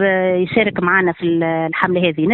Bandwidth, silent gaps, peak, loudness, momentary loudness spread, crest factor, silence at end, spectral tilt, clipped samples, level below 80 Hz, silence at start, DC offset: 4.3 kHz; none; 0 dBFS; -16 LUFS; 3 LU; 16 dB; 0 s; -9.5 dB/octave; under 0.1%; -52 dBFS; 0 s; under 0.1%